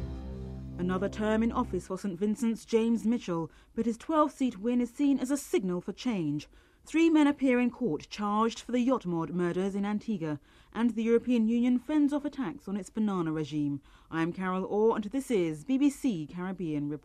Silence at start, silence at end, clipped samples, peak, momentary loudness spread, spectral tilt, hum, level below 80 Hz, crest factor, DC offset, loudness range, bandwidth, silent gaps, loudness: 0 s; 0.05 s; under 0.1%; -14 dBFS; 10 LU; -6.5 dB/octave; none; -52 dBFS; 16 dB; under 0.1%; 3 LU; 14 kHz; none; -30 LUFS